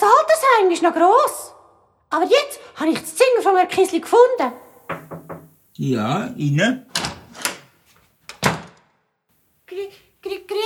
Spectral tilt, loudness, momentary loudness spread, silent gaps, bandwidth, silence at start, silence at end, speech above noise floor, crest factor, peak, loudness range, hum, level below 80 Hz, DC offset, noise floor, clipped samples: -4.5 dB/octave; -18 LUFS; 21 LU; none; 17 kHz; 0 s; 0 s; 48 dB; 20 dB; 0 dBFS; 10 LU; none; -58 dBFS; under 0.1%; -65 dBFS; under 0.1%